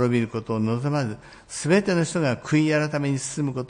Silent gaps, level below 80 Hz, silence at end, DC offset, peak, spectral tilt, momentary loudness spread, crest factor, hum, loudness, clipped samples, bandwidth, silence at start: none; -58 dBFS; 0.05 s; under 0.1%; -8 dBFS; -6 dB/octave; 9 LU; 16 dB; none; -24 LUFS; under 0.1%; 10.5 kHz; 0 s